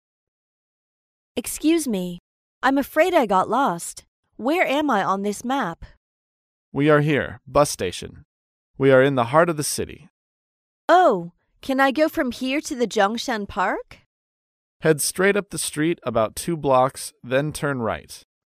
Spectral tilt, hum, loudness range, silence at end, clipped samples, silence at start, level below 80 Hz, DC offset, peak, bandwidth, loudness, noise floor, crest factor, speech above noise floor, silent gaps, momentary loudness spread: -4.5 dB/octave; none; 3 LU; 0.35 s; under 0.1%; 1.35 s; -52 dBFS; under 0.1%; -2 dBFS; 15.5 kHz; -21 LUFS; under -90 dBFS; 20 dB; over 69 dB; 2.20-2.61 s, 4.08-4.23 s, 5.97-6.72 s, 8.25-8.74 s, 10.10-10.88 s, 14.06-14.80 s; 15 LU